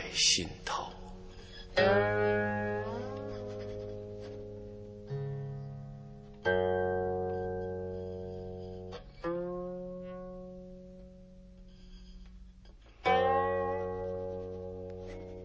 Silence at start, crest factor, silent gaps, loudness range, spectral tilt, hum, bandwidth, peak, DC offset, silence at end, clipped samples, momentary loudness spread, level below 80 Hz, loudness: 0 s; 22 dB; none; 10 LU; -3.5 dB/octave; none; 8 kHz; -14 dBFS; under 0.1%; 0 s; under 0.1%; 22 LU; -52 dBFS; -34 LUFS